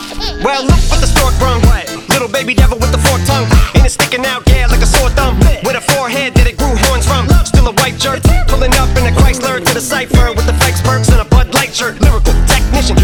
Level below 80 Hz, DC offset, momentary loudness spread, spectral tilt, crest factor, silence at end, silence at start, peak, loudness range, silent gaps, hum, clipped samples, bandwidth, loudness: -12 dBFS; under 0.1%; 3 LU; -4.5 dB/octave; 10 dB; 0 s; 0 s; 0 dBFS; 1 LU; none; none; under 0.1%; 19 kHz; -11 LUFS